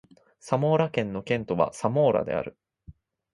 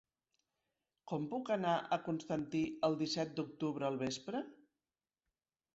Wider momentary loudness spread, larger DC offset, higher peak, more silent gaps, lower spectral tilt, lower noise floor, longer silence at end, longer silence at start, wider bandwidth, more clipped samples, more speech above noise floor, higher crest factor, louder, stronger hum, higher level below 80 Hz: about the same, 8 LU vs 8 LU; neither; first, -8 dBFS vs -20 dBFS; neither; first, -7 dB/octave vs -5 dB/octave; second, -52 dBFS vs under -90 dBFS; second, 0.45 s vs 1.2 s; second, 0.45 s vs 1.05 s; first, 11.5 kHz vs 8 kHz; neither; second, 27 dB vs over 52 dB; about the same, 20 dB vs 20 dB; first, -26 LUFS vs -39 LUFS; neither; first, -58 dBFS vs -76 dBFS